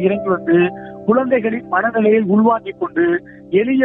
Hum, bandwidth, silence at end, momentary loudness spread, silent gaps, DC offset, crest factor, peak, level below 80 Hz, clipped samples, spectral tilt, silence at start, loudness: none; 3.8 kHz; 0 s; 6 LU; none; under 0.1%; 14 dB; -2 dBFS; -56 dBFS; under 0.1%; -10.5 dB/octave; 0 s; -16 LUFS